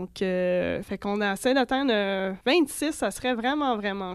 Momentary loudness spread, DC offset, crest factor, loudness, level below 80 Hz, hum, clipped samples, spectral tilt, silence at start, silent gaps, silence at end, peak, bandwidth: 5 LU; under 0.1%; 16 dB; -26 LUFS; -56 dBFS; none; under 0.1%; -4.5 dB/octave; 0 s; none; 0 s; -10 dBFS; 14 kHz